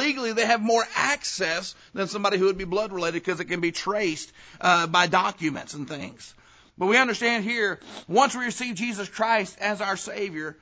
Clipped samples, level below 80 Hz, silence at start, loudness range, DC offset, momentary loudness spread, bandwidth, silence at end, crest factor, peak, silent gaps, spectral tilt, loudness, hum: under 0.1%; -60 dBFS; 0 s; 2 LU; under 0.1%; 12 LU; 8 kHz; 0.1 s; 20 dB; -6 dBFS; none; -3.5 dB/octave; -24 LUFS; none